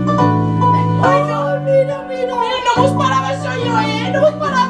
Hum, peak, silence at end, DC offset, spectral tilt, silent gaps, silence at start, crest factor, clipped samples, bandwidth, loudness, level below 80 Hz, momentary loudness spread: none; -2 dBFS; 0 s; under 0.1%; -6.5 dB/octave; none; 0 s; 14 dB; under 0.1%; 11 kHz; -15 LUFS; -46 dBFS; 6 LU